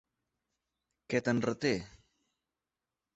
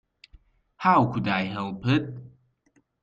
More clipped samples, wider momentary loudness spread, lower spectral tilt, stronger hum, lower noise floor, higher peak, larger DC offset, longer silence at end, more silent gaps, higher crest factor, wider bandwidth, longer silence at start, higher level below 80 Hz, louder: neither; second, 7 LU vs 13 LU; second, -5.5 dB/octave vs -7.5 dB/octave; neither; first, under -90 dBFS vs -67 dBFS; second, -16 dBFS vs -6 dBFS; neither; first, 1.3 s vs 0.75 s; neither; about the same, 22 dB vs 20 dB; first, 8.2 kHz vs 7.4 kHz; first, 1.1 s vs 0.8 s; second, -66 dBFS vs -58 dBFS; second, -33 LUFS vs -24 LUFS